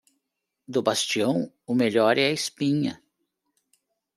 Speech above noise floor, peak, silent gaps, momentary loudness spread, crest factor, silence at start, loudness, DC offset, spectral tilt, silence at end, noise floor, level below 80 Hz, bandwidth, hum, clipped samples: 58 dB; -6 dBFS; none; 8 LU; 20 dB; 0.7 s; -24 LUFS; under 0.1%; -4 dB/octave; 1.2 s; -81 dBFS; -72 dBFS; 14.5 kHz; none; under 0.1%